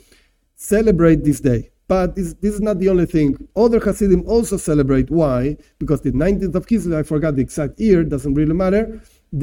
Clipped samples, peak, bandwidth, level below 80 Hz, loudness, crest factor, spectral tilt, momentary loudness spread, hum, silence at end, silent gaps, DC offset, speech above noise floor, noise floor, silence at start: under 0.1%; -2 dBFS; 17 kHz; -32 dBFS; -17 LUFS; 16 dB; -7.5 dB/octave; 7 LU; none; 0 s; none; under 0.1%; 39 dB; -55 dBFS; 0.6 s